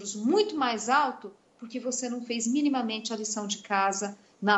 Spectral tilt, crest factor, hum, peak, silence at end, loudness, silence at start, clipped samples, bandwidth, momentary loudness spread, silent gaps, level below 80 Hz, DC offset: -3 dB/octave; 18 dB; none; -10 dBFS; 0 s; -28 LUFS; 0 s; under 0.1%; 8.4 kHz; 12 LU; none; -80 dBFS; under 0.1%